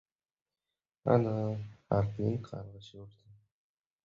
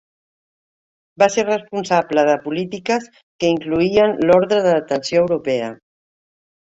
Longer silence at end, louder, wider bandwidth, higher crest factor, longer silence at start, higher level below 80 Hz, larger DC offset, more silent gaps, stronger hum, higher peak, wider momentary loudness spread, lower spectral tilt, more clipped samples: about the same, 0.95 s vs 0.9 s; second, -32 LUFS vs -18 LUFS; second, 7 kHz vs 8 kHz; first, 24 dB vs 18 dB; second, 1.05 s vs 1.2 s; about the same, -60 dBFS vs -56 dBFS; neither; second, none vs 3.23-3.39 s; neither; second, -12 dBFS vs -2 dBFS; first, 21 LU vs 8 LU; first, -9.5 dB/octave vs -5 dB/octave; neither